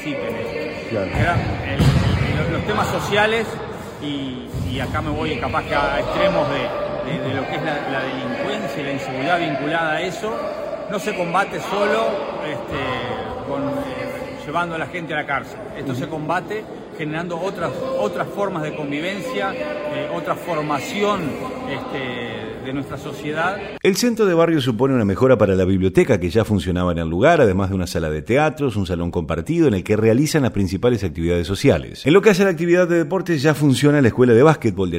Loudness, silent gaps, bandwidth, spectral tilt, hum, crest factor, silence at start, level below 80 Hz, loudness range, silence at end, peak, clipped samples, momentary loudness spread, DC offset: -20 LUFS; none; 16 kHz; -6 dB/octave; none; 20 dB; 0 s; -40 dBFS; 8 LU; 0 s; 0 dBFS; under 0.1%; 11 LU; under 0.1%